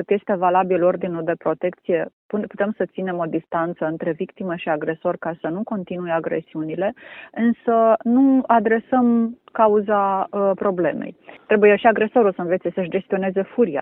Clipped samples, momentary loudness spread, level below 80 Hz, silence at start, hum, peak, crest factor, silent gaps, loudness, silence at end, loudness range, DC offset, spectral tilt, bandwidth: under 0.1%; 11 LU; -64 dBFS; 0 s; none; -2 dBFS; 18 dB; 2.13-2.29 s; -20 LUFS; 0 s; 7 LU; under 0.1%; -11 dB/octave; 3.9 kHz